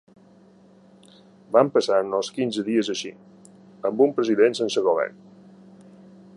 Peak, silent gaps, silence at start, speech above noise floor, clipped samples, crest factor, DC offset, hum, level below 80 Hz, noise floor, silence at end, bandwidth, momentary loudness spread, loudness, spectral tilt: -4 dBFS; none; 1.5 s; 31 dB; under 0.1%; 22 dB; under 0.1%; none; -74 dBFS; -53 dBFS; 1.25 s; 11 kHz; 10 LU; -22 LUFS; -4.5 dB/octave